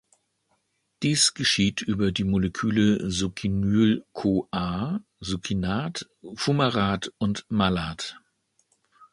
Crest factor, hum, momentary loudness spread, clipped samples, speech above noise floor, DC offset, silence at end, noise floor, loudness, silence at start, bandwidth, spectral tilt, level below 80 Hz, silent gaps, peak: 20 dB; none; 11 LU; under 0.1%; 47 dB; under 0.1%; 0.95 s; -72 dBFS; -25 LUFS; 1 s; 11.5 kHz; -4.5 dB/octave; -48 dBFS; none; -6 dBFS